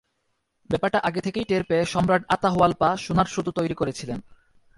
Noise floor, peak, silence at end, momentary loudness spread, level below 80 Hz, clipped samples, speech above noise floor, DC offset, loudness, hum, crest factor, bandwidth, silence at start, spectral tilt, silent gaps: -74 dBFS; -4 dBFS; 0.55 s; 8 LU; -50 dBFS; under 0.1%; 50 dB; under 0.1%; -23 LUFS; none; 20 dB; 11.5 kHz; 0.7 s; -6 dB/octave; none